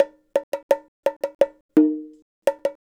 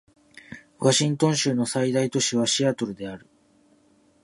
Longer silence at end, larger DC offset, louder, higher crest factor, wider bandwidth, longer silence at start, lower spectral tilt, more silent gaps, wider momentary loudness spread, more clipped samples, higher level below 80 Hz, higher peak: second, 0.1 s vs 1.05 s; neither; about the same, -24 LUFS vs -23 LUFS; about the same, 20 dB vs 20 dB; first, 17 kHz vs 11.5 kHz; second, 0 s vs 0.5 s; first, -5.5 dB/octave vs -4 dB/octave; first, 0.43-0.52 s, 0.63-0.69 s, 0.88-1.03 s, 1.16-1.20 s, 1.35-1.39 s, 1.61-1.69 s, 2.22-2.42 s vs none; second, 8 LU vs 23 LU; neither; about the same, -70 dBFS vs -66 dBFS; first, -2 dBFS vs -6 dBFS